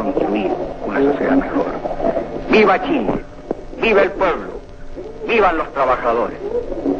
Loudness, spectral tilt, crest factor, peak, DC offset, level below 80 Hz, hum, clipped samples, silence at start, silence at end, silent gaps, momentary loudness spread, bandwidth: -18 LUFS; -6.5 dB/octave; 16 dB; -2 dBFS; 0.7%; -36 dBFS; none; under 0.1%; 0 s; 0 s; none; 14 LU; 7.2 kHz